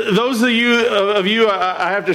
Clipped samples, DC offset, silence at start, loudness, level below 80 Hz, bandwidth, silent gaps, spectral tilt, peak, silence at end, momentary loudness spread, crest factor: under 0.1%; under 0.1%; 0 s; -15 LUFS; -60 dBFS; 15 kHz; none; -4.5 dB/octave; -6 dBFS; 0 s; 4 LU; 10 dB